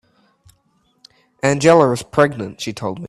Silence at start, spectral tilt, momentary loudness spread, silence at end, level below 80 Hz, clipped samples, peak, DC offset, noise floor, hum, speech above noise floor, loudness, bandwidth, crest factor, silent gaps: 1.45 s; -5.5 dB/octave; 14 LU; 0 s; -54 dBFS; under 0.1%; 0 dBFS; under 0.1%; -62 dBFS; none; 46 dB; -16 LUFS; 13.5 kHz; 18 dB; none